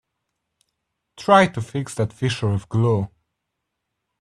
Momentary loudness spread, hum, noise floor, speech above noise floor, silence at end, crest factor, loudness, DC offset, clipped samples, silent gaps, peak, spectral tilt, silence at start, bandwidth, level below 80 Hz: 12 LU; none; -79 dBFS; 60 dB; 1.15 s; 22 dB; -21 LUFS; under 0.1%; under 0.1%; none; 0 dBFS; -6 dB/octave; 1.2 s; 12 kHz; -56 dBFS